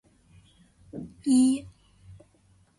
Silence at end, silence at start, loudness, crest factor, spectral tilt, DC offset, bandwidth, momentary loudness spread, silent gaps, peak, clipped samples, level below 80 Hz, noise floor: 1.1 s; 0.95 s; -24 LUFS; 16 dB; -4.5 dB/octave; under 0.1%; 11.5 kHz; 21 LU; none; -12 dBFS; under 0.1%; -60 dBFS; -62 dBFS